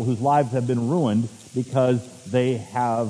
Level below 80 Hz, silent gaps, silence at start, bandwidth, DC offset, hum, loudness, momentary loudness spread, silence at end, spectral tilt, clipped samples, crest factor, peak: -64 dBFS; none; 0 s; 11 kHz; under 0.1%; none; -23 LUFS; 6 LU; 0 s; -7.5 dB/octave; under 0.1%; 16 dB; -6 dBFS